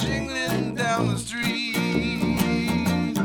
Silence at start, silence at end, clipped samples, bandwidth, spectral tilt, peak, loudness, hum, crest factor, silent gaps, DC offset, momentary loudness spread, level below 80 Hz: 0 s; 0 s; under 0.1%; 19.5 kHz; -5 dB/octave; -8 dBFS; -24 LUFS; none; 16 dB; none; under 0.1%; 3 LU; -42 dBFS